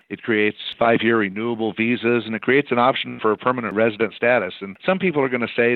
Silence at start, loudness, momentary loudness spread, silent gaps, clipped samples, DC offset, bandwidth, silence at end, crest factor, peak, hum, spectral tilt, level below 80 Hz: 0.1 s; -20 LUFS; 5 LU; none; under 0.1%; under 0.1%; 4.6 kHz; 0 s; 16 dB; -4 dBFS; none; -9 dB/octave; -64 dBFS